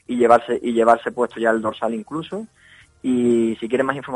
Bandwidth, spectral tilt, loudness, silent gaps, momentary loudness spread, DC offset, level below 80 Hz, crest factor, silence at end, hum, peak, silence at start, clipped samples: 11 kHz; -6 dB/octave; -20 LUFS; none; 13 LU; under 0.1%; -60 dBFS; 18 dB; 0 s; none; -2 dBFS; 0.1 s; under 0.1%